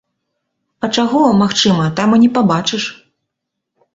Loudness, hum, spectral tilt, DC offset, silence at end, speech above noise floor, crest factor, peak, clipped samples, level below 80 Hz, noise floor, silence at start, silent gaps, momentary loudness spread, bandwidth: -13 LUFS; none; -5 dB/octave; under 0.1%; 1 s; 64 dB; 14 dB; -2 dBFS; under 0.1%; -52 dBFS; -77 dBFS; 0.8 s; none; 9 LU; 8 kHz